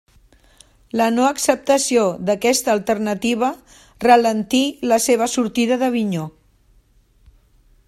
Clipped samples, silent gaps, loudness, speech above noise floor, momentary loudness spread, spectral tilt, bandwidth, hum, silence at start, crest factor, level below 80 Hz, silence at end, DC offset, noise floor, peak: under 0.1%; none; -18 LUFS; 38 dB; 8 LU; -3.5 dB/octave; 14.5 kHz; none; 0.95 s; 20 dB; -54 dBFS; 1.6 s; under 0.1%; -55 dBFS; 0 dBFS